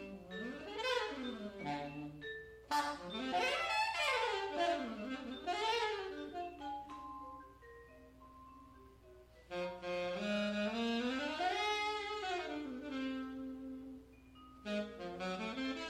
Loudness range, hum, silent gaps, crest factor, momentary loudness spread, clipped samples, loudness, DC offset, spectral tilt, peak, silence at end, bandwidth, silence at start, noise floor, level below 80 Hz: 10 LU; none; none; 18 dB; 21 LU; under 0.1%; -40 LUFS; under 0.1%; -4 dB/octave; -22 dBFS; 0 s; 16 kHz; 0 s; -61 dBFS; -66 dBFS